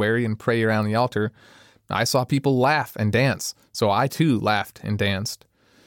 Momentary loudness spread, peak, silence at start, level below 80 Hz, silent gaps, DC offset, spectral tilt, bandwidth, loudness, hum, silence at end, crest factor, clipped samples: 9 LU; -6 dBFS; 0 s; -58 dBFS; none; under 0.1%; -5.5 dB/octave; 17.5 kHz; -22 LUFS; none; 0.5 s; 16 dB; under 0.1%